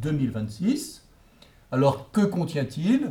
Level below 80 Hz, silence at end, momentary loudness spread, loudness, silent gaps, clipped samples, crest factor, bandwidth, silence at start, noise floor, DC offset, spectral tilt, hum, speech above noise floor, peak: -54 dBFS; 0 s; 7 LU; -26 LUFS; none; under 0.1%; 16 dB; 16.5 kHz; 0 s; -54 dBFS; under 0.1%; -7 dB/octave; none; 30 dB; -8 dBFS